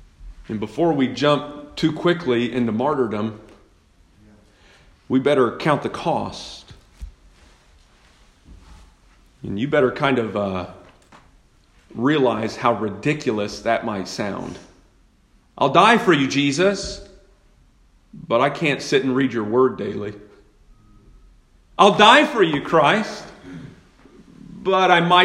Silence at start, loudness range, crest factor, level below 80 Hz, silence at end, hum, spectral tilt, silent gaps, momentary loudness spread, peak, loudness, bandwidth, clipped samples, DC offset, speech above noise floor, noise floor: 0.2 s; 7 LU; 22 dB; -50 dBFS; 0 s; none; -5 dB/octave; none; 19 LU; 0 dBFS; -19 LUFS; 12 kHz; under 0.1%; under 0.1%; 38 dB; -56 dBFS